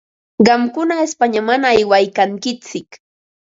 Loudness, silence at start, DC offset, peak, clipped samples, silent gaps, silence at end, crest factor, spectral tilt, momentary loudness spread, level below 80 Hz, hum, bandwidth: -15 LUFS; 0.4 s; under 0.1%; 0 dBFS; under 0.1%; none; 0.5 s; 16 dB; -4.5 dB/octave; 15 LU; -56 dBFS; none; 7.8 kHz